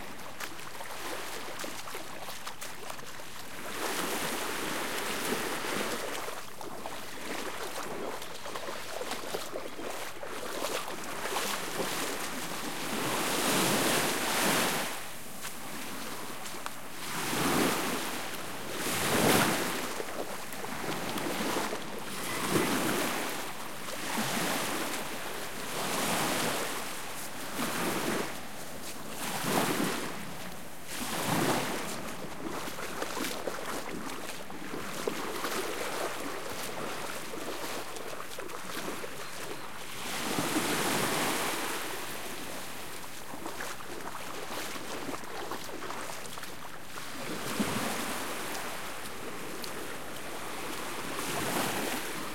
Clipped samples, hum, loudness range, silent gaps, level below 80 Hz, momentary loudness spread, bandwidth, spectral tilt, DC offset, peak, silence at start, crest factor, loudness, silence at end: under 0.1%; none; 9 LU; none; -62 dBFS; 12 LU; 16.5 kHz; -2.5 dB/octave; 1%; -12 dBFS; 0 s; 22 dB; -34 LUFS; 0 s